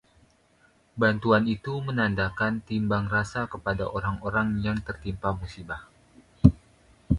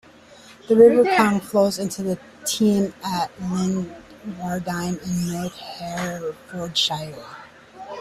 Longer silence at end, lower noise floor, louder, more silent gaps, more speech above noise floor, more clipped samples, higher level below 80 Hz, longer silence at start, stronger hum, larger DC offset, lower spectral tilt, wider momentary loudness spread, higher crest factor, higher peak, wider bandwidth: about the same, 0 s vs 0 s; first, -62 dBFS vs -47 dBFS; second, -26 LUFS vs -21 LUFS; neither; first, 35 dB vs 26 dB; neither; first, -42 dBFS vs -56 dBFS; first, 0.95 s vs 0.5 s; neither; neither; first, -7.5 dB/octave vs -5 dB/octave; second, 14 LU vs 20 LU; first, 26 dB vs 20 dB; about the same, 0 dBFS vs -2 dBFS; second, 11 kHz vs 14.5 kHz